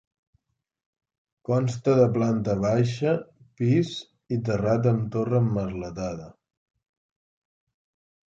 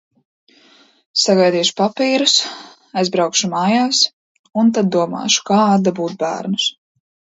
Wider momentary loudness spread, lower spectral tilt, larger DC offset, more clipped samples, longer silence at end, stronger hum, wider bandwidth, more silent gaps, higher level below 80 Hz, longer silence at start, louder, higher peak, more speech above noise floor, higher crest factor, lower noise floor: first, 11 LU vs 8 LU; first, -8 dB/octave vs -3.5 dB/octave; neither; neither; first, 2 s vs 0.65 s; neither; about the same, 7.8 kHz vs 8 kHz; second, none vs 4.13-4.44 s; first, -54 dBFS vs -66 dBFS; first, 1.5 s vs 1.15 s; second, -25 LUFS vs -16 LUFS; second, -8 dBFS vs 0 dBFS; first, 48 dB vs 35 dB; about the same, 18 dB vs 18 dB; first, -72 dBFS vs -51 dBFS